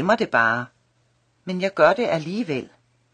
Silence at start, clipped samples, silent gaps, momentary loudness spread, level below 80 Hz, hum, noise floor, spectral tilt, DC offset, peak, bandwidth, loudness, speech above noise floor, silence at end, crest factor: 0 s; under 0.1%; none; 13 LU; -66 dBFS; none; -65 dBFS; -6 dB/octave; under 0.1%; -4 dBFS; 9.6 kHz; -21 LUFS; 44 dB; 0.5 s; 20 dB